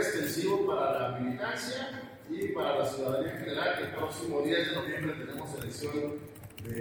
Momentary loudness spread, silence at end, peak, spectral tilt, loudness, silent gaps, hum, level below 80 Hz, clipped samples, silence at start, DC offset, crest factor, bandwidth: 11 LU; 0 s; -16 dBFS; -4.5 dB/octave; -33 LUFS; none; none; -64 dBFS; under 0.1%; 0 s; under 0.1%; 16 dB; over 20 kHz